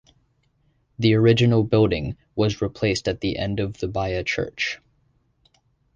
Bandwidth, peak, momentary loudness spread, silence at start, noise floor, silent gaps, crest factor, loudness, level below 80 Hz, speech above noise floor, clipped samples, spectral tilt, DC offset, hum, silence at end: 7.6 kHz; -6 dBFS; 10 LU; 1 s; -65 dBFS; none; 18 dB; -22 LUFS; -44 dBFS; 44 dB; under 0.1%; -6.5 dB/octave; under 0.1%; none; 1.2 s